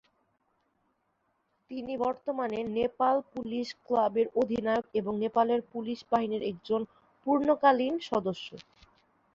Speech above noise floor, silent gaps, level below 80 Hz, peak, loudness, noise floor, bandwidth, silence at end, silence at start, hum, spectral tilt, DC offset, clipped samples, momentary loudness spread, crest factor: 46 dB; none; -68 dBFS; -10 dBFS; -30 LUFS; -76 dBFS; 7.6 kHz; 0.75 s; 1.7 s; none; -6.5 dB/octave; under 0.1%; under 0.1%; 11 LU; 20 dB